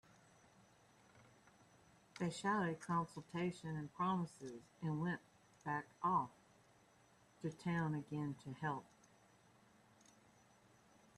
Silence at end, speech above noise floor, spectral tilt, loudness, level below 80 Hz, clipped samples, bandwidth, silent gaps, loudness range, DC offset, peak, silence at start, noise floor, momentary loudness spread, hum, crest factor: 2.35 s; 28 dB; -6.5 dB/octave; -43 LUFS; -78 dBFS; under 0.1%; 12 kHz; none; 4 LU; under 0.1%; -26 dBFS; 1.15 s; -71 dBFS; 10 LU; none; 20 dB